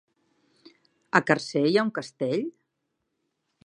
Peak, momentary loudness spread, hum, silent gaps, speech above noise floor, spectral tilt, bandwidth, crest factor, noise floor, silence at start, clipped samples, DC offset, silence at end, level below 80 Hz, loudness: -2 dBFS; 8 LU; none; none; 54 dB; -5.5 dB/octave; 11 kHz; 26 dB; -79 dBFS; 1.15 s; under 0.1%; under 0.1%; 1.15 s; -72 dBFS; -25 LUFS